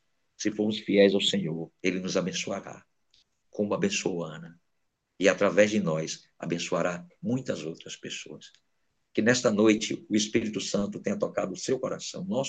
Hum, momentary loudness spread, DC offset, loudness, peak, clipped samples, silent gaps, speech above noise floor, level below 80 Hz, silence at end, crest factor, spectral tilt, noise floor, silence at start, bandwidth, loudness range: none; 15 LU; under 0.1%; -28 LUFS; -6 dBFS; under 0.1%; none; 50 dB; -70 dBFS; 0 s; 22 dB; -4.5 dB/octave; -78 dBFS; 0.4 s; 9 kHz; 5 LU